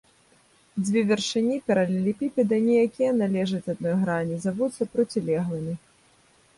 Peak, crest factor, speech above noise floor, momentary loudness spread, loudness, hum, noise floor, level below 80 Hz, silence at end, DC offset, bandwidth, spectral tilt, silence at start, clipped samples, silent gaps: -10 dBFS; 16 dB; 36 dB; 8 LU; -25 LUFS; none; -60 dBFS; -64 dBFS; 0.8 s; under 0.1%; 11.5 kHz; -6 dB/octave; 0.75 s; under 0.1%; none